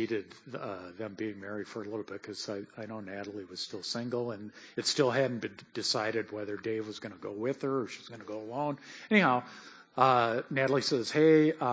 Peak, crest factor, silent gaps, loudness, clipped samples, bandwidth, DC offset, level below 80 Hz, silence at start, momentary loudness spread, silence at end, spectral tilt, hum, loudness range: -8 dBFS; 22 dB; none; -31 LUFS; under 0.1%; 8 kHz; under 0.1%; -74 dBFS; 0 s; 17 LU; 0 s; -4.5 dB/octave; none; 10 LU